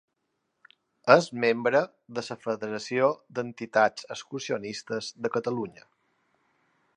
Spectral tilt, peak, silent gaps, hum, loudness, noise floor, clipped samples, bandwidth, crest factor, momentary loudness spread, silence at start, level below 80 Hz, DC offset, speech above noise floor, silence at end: -4.5 dB/octave; -2 dBFS; none; none; -27 LUFS; -79 dBFS; under 0.1%; 10.5 kHz; 26 dB; 15 LU; 1.05 s; -76 dBFS; under 0.1%; 52 dB; 1.25 s